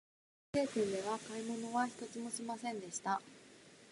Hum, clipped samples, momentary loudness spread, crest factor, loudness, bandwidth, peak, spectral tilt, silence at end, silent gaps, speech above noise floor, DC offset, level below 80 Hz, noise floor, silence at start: none; under 0.1%; 17 LU; 18 dB; -40 LUFS; 11.5 kHz; -22 dBFS; -4 dB/octave; 0 s; none; 21 dB; under 0.1%; -76 dBFS; -60 dBFS; 0.55 s